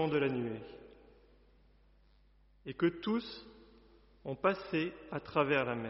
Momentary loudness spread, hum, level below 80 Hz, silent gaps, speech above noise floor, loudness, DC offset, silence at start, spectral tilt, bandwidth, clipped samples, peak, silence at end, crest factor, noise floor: 19 LU; none; -66 dBFS; none; 31 dB; -35 LUFS; under 0.1%; 0 s; -4.5 dB/octave; 5.8 kHz; under 0.1%; -16 dBFS; 0 s; 20 dB; -66 dBFS